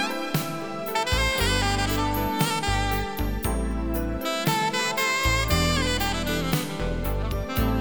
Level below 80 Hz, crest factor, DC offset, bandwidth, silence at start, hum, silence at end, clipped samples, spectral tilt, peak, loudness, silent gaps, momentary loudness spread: -32 dBFS; 16 dB; 0.5%; over 20 kHz; 0 s; none; 0 s; under 0.1%; -4 dB/octave; -10 dBFS; -25 LUFS; none; 6 LU